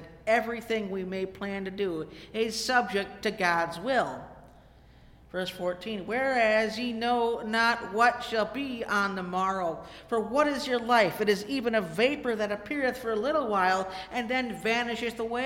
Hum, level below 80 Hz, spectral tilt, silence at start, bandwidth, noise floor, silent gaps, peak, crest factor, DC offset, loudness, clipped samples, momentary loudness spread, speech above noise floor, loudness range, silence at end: none; -58 dBFS; -4 dB/octave; 0 s; 17 kHz; -55 dBFS; none; -10 dBFS; 18 dB; under 0.1%; -28 LUFS; under 0.1%; 9 LU; 26 dB; 3 LU; 0 s